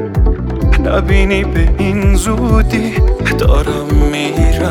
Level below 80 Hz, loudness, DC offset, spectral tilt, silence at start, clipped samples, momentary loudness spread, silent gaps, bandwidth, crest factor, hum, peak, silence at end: -14 dBFS; -13 LUFS; under 0.1%; -6.5 dB/octave; 0 s; under 0.1%; 3 LU; none; 14.5 kHz; 10 dB; none; 0 dBFS; 0 s